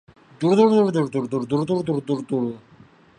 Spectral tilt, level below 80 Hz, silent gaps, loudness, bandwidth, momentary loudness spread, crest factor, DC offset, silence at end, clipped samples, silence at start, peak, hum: -7.5 dB/octave; -62 dBFS; none; -21 LUFS; 10.5 kHz; 10 LU; 16 dB; under 0.1%; 0.6 s; under 0.1%; 0.4 s; -6 dBFS; none